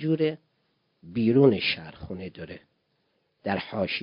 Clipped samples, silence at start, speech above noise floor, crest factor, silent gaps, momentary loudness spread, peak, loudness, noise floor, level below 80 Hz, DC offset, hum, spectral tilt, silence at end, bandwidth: under 0.1%; 0 s; 47 dB; 22 dB; none; 22 LU; -6 dBFS; -25 LUFS; -73 dBFS; -56 dBFS; under 0.1%; none; -10.5 dB/octave; 0 s; 5.4 kHz